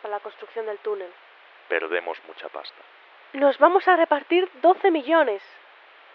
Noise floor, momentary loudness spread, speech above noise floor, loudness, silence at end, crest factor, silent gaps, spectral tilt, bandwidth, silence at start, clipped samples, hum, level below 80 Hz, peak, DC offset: -50 dBFS; 19 LU; 28 dB; -22 LUFS; 0.75 s; 22 dB; none; 1.5 dB/octave; 5.6 kHz; 0.05 s; under 0.1%; none; under -90 dBFS; -2 dBFS; under 0.1%